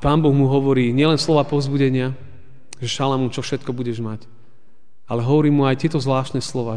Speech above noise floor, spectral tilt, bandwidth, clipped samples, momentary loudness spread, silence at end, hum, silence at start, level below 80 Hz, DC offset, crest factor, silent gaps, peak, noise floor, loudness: 43 dB; -6.5 dB/octave; 10 kHz; under 0.1%; 11 LU; 0 s; none; 0 s; -46 dBFS; 2%; 16 dB; none; -4 dBFS; -61 dBFS; -19 LUFS